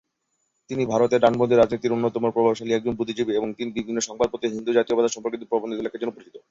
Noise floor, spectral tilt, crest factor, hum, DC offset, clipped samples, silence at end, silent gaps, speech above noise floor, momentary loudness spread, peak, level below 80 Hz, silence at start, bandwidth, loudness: -74 dBFS; -5 dB/octave; 20 dB; none; under 0.1%; under 0.1%; 0.1 s; none; 52 dB; 11 LU; -4 dBFS; -58 dBFS; 0.7 s; 7.8 kHz; -23 LUFS